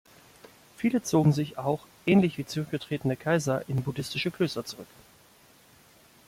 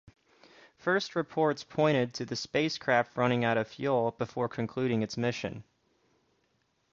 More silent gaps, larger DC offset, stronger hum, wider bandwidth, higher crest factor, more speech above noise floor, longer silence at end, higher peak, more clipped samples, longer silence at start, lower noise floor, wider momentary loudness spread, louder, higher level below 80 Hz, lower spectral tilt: neither; neither; neither; first, 16 kHz vs 7.6 kHz; about the same, 18 dB vs 20 dB; second, 31 dB vs 44 dB; first, 1.45 s vs 1.3 s; about the same, -10 dBFS vs -12 dBFS; neither; about the same, 0.8 s vs 0.85 s; second, -58 dBFS vs -74 dBFS; about the same, 9 LU vs 7 LU; about the same, -28 LUFS vs -30 LUFS; first, -62 dBFS vs -68 dBFS; about the same, -6 dB/octave vs -5.5 dB/octave